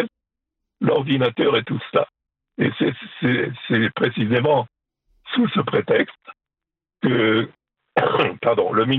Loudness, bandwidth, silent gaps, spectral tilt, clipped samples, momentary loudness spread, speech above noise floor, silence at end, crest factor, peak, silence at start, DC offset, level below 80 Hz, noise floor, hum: -21 LUFS; 4.7 kHz; none; -9 dB/octave; under 0.1%; 7 LU; 69 dB; 0 s; 18 dB; -4 dBFS; 0 s; under 0.1%; -64 dBFS; -88 dBFS; none